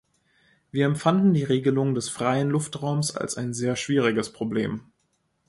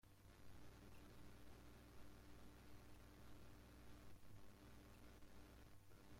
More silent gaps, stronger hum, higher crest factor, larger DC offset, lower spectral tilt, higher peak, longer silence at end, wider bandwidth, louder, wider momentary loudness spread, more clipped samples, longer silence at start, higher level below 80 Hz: neither; second, none vs 60 Hz at -70 dBFS; first, 18 dB vs 12 dB; neither; about the same, -5.5 dB/octave vs -5 dB/octave; first, -8 dBFS vs -50 dBFS; first, 0.7 s vs 0 s; second, 11.5 kHz vs 16.5 kHz; first, -25 LUFS vs -66 LUFS; first, 8 LU vs 2 LU; neither; first, 0.75 s vs 0.05 s; first, -62 dBFS vs -70 dBFS